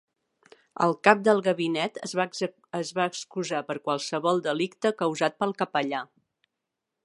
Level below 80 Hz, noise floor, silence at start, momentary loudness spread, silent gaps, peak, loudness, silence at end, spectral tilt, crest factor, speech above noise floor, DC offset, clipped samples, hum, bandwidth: -78 dBFS; -85 dBFS; 0.8 s; 11 LU; none; -2 dBFS; -27 LUFS; 1 s; -4.5 dB/octave; 26 dB; 58 dB; under 0.1%; under 0.1%; none; 11.5 kHz